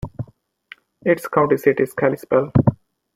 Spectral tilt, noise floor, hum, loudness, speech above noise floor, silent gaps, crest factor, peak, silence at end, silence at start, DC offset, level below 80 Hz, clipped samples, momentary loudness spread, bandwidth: -8.5 dB/octave; -47 dBFS; none; -19 LUFS; 30 dB; none; 18 dB; -2 dBFS; 0.4 s; 0.05 s; under 0.1%; -46 dBFS; under 0.1%; 15 LU; 16 kHz